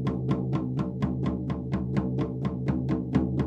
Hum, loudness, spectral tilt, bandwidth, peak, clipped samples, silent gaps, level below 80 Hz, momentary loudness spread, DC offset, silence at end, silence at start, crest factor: none; -29 LUFS; -9.5 dB/octave; 7.4 kHz; -10 dBFS; under 0.1%; none; -42 dBFS; 3 LU; under 0.1%; 0 s; 0 s; 18 dB